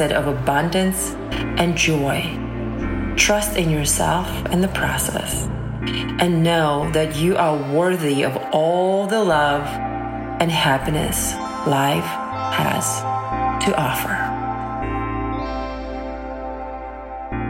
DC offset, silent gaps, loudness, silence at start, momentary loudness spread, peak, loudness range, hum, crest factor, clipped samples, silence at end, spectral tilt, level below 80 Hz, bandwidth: under 0.1%; none; -20 LUFS; 0 s; 10 LU; -2 dBFS; 4 LU; none; 20 dB; under 0.1%; 0 s; -4.5 dB/octave; -34 dBFS; 16.5 kHz